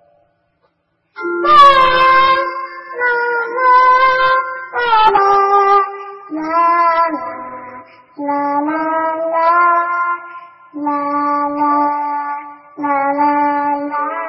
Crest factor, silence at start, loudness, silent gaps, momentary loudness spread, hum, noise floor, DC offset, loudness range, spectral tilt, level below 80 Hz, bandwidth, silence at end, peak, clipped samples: 14 dB; 1.15 s; -13 LUFS; none; 16 LU; none; -63 dBFS; under 0.1%; 6 LU; -4.5 dB/octave; -48 dBFS; 9 kHz; 0 s; 0 dBFS; under 0.1%